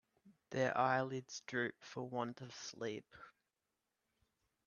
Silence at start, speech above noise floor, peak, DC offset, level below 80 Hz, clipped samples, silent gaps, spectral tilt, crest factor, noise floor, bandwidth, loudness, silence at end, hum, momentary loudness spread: 0.25 s; 48 dB; -20 dBFS; under 0.1%; -82 dBFS; under 0.1%; none; -4.5 dB/octave; 22 dB; -89 dBFS; 7.4 kHz; -41 LUFS; 1.35 s; none; 14 LU